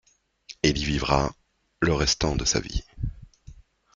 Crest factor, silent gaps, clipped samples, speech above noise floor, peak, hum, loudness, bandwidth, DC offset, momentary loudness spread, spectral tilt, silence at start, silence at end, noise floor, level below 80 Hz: 24 dB; none; under 0.1%; 25 dB; -4 dBFS; none; -25 LUFS; 9.4 kHz; under 0.1%; 13 LU; -4 dB/octave; 0.5 s; 0.45 s; -49 dBFS; -36 dBFS